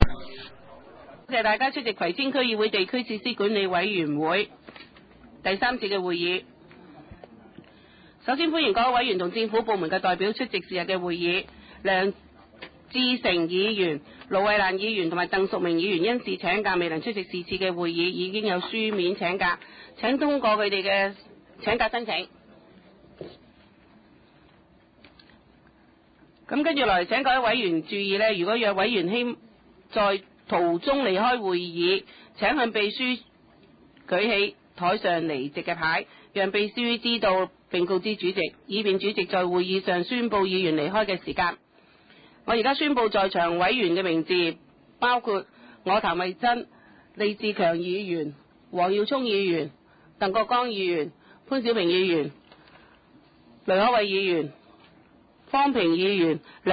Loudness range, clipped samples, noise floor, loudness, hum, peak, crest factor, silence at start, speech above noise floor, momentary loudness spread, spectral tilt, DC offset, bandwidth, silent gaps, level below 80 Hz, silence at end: 3 LU; under 0.1%; -58 dBFS; -25 LUFS; none; 0 dBFS; 26 dB; 0 s; 33 dB; 9 LU; -8 dB/octave; under 0.1%; 5 kHz; none; -46 dBFS; 0 s